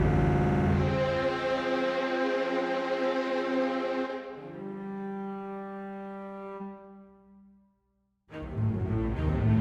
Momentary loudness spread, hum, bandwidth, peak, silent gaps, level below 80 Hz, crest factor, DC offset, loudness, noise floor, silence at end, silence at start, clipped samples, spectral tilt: 15 LU; none; 8.6 kHz; -14 dBFS; none; -42 dBFS; 16 dB; under 0.1%; -30 LUFS; -74 dBFS; 0 s; 0 s; under 0.1%; -8 dB/octave